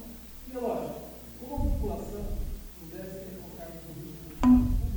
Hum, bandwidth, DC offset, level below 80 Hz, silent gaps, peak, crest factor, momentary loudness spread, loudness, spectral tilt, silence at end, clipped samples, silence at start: none; over 20 kHz; under 0.1%; -36 dBFS; none; -10 dBFS; 20 dB; 20 LU; -30 LUFS; -7.5 dB/octave; 0 s; under 0.1%; 0 s